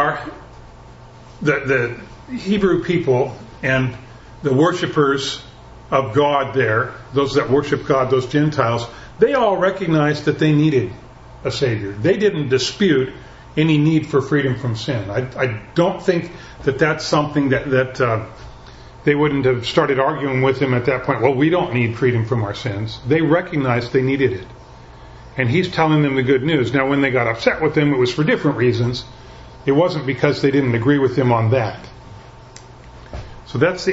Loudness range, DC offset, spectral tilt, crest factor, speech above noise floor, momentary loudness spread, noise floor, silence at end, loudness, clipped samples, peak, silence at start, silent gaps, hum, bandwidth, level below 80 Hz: 3 LU; under 0.1%; -6.5 dB/octave; 18 dB; 23 dB; 10 LU; -40 dBFS; 0 s; -18 LUFS; under 0.1%; 0 dBFS; 0 s; none; none; 8 kHz; -44 dBFS